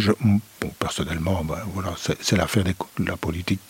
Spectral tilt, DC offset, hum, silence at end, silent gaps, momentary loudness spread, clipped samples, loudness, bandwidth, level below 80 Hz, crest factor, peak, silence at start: -5.5 dB/octave; under 0.1%; none; 0.05 s; none; 8 LU; under 0.1%; -25 LUFS; 16.5 kHz; -42 dBFS; 20 dB; -4 dBFS; 0 s